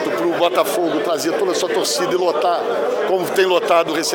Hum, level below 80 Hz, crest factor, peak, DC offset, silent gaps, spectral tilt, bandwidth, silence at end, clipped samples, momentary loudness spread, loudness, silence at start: none; -66 dBFS; 14 dB; -4 dBFS; under 0.1%; none; -3 dB/octave; 17 kHz; 0 s; under 0.1%; 3 LU; -18 LUFS; 0 s